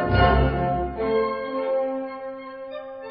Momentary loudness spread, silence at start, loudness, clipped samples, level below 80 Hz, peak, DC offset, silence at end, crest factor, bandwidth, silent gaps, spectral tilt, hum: 17 LU; 0 s; -23 LUFS; under 0.1%; -32 dBFS; -6 dBFS; under 0.1%; 0 s; 18 dB; 5.4 kHz; none; -11.5 dB/octave; none